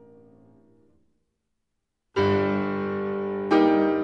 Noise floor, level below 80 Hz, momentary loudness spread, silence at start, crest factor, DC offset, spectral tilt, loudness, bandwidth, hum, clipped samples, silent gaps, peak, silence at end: -80 dBFS; -62 dBFS; 9 LU; 2.15 s; 18 dB; under 0.1%; -8 dB/octave; -24 LUFS; 6.8 kHz; none; under 0.1%; none; -8 dBFS; 0 s